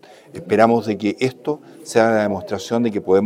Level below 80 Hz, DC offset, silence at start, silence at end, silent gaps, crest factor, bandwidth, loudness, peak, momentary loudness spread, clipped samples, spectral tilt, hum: -62 dBFS; under 0.1%; 0.35 s; 0 s; none; 18 dB; 15.5 kHz; -19 LUFS; 0 dBFS; 12 LU; under 0.1%; -6 dB/octave; none